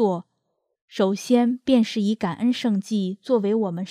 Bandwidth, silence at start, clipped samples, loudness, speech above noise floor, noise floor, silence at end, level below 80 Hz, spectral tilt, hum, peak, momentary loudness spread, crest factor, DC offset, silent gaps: 13.5 kHz; 0 s; under 0.1%; -23 LUFS; 53 dB; -75 dBFS; 0 s; -66 dBFS; -6.5 dB/octave; none; -6 dBFS; 6 LU; 16 dB; under 0.1%; 0.81-0.88 s